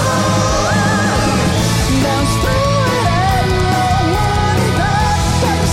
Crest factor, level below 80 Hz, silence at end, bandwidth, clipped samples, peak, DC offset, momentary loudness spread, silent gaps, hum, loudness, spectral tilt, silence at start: 10 dB; -24 dBFS; 0 s; 16.5 kHz; under 0.1%; -4 dBFS; under 0.1%; 1 LU; none; none; -14 LUFS; -5 dB/octave; 0 s